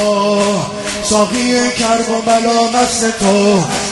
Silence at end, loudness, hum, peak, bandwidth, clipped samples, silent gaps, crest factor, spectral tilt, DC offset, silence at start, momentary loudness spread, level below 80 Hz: 0 s; -13 LUFS; none; 0 dBFS; 12 kHz; under 0.1%; none; 12 dB; -3.5 dB/octave; under 0.1%; 0 s; 3 LU; -42 dBFS